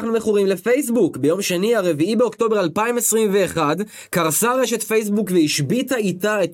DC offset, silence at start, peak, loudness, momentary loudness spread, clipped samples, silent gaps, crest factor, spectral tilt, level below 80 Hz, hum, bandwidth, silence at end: under 0.1%; 0 s; -6 dBFS; -19 LUFS; 3 LU; under 0.1%; none; 14 dB; -4 dB/octave; -62 dBFS; none; 17 kHz; 0 s